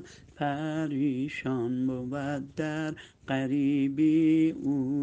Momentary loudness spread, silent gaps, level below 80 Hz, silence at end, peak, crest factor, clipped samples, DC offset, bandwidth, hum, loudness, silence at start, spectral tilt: 10 LU; none; -64 dBFS; 0 s; -14 dBFS; 14 dB; under 0.1%; under 0.1%; 8.4 kHz; none; -29 LUFS; 0 s; -7.5 dB/octave